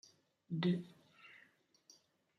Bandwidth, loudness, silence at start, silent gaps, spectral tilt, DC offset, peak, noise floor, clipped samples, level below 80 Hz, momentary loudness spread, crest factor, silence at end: 6.6 kHz; -39 LUFS; 0.5 s; none; -7 dB/octave; under 0.1%; -24 dBFS; -71 dBFS; under 0.1%; -88 dBFS; 24 LU; 22 dB; 1.05 s